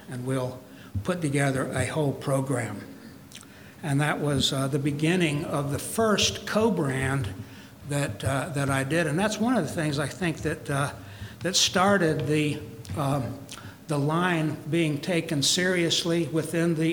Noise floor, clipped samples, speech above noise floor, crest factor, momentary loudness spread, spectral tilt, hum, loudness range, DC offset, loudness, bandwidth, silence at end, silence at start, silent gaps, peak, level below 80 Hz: -46 dBFS; under 0.1%; 21 dB; 18 dB; 15 LU; -4.5 dB/octave; none; 3 LU; under 0.1%; -26 LUFS; 19.5 kHz; 0 s; 0 s; none; -8 dBFS; -54 dBFS